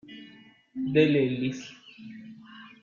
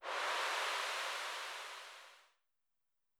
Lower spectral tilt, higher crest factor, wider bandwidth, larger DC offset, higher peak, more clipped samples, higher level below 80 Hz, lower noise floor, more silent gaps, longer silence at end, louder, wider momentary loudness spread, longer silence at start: first, -7 dB/octave vs 3.5 dB/octave; about the same, 20 dB vs 16 dB; second, 7.2 kHz vs over 20 kHz; neither; first, -10 dBFS vs -26 dBFS; neither; first, -68 dBFS vs under -90 dBFS; second, -54 dBFS vs -87 dBFS; neither; second, 0.15 s vs 0.95 s; first, -26 LUFS vs -39 LUFS; first, 24 LU vs 17 LU; about the same, 0.1 s vs 0 s